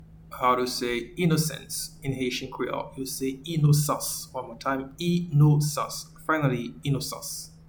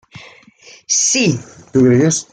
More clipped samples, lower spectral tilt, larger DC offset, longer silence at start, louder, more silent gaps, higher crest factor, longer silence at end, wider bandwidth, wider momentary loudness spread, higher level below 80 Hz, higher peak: neither; first, -5.5 dB/octave vs -4 dB/octave; neither; second, 0 s vs 0.15 s; second, -27 LUFS vs -14 LUFS; neither; about the same, 18 dB vs 14 dB; about the same, 0.05 s vs 0.1 s; first, 19 kHz vs 10 kHz; first, 11 LU vs 7 LU; about the same, -52 dBFS vs -56 dBFS; second, -10 dBFS vs -2 dBFS